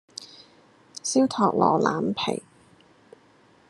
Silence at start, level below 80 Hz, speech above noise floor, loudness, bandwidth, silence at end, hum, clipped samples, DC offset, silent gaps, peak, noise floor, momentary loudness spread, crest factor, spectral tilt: 0.2 s; -70 dBFS; 35 dB; -24 LUFS; 12 kHz; 1.3 s; none; under 0.1%; under 0.1%; none; -6 dBFS; -58 dBFS; 20 LU; 22 dB; -4.5 dB/octave